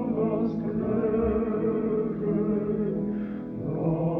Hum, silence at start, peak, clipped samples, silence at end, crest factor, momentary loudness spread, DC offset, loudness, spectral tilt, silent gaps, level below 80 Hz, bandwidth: none; 0 s; -14 dBFS; under 0.1%; 0 s; 12 dB; 6 LU; under 0.1%; -27 LUFS; -12 dB/octave; none; -46 dBFS; 3.8 kHz